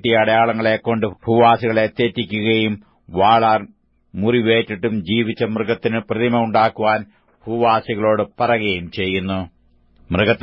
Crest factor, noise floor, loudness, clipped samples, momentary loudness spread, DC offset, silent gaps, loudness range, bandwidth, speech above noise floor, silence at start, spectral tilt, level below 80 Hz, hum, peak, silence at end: 16 dB; -53 dBFS; -18 LUFS; under 0.1%; 9 LU; under 0.1%; none; 3 LU; 5.8 kHz; 36 dB; 0.05 s; -9 dB/octave; -50 dBFS; none; -2 dBFS; 0.05 s